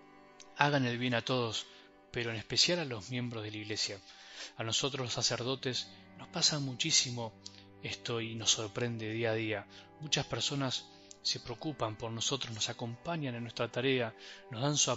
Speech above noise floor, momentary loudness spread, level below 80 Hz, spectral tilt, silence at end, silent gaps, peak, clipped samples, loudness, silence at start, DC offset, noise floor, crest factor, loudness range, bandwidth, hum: 22 dB; 17 LU; -68 dBFS; -3 dB/octave; 0 s; none; -8 dBFS; under 0.1%; -34 LUFS; 0 s; under 0.1%; -57 dBFS; 28 dB; 3 LU; 8.2 kHz; none